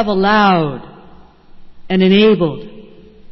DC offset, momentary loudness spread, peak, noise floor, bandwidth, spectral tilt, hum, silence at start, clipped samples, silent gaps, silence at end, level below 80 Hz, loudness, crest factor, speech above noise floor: under 0.1%; 15 LU; -2 dBFS; -41 dBFS; 6 kHz; -8 dB/octave; none; 0 s; under 0.1%; none; 0 s; -46 dBFS; -13 LUFS; 14 dB; 28 dB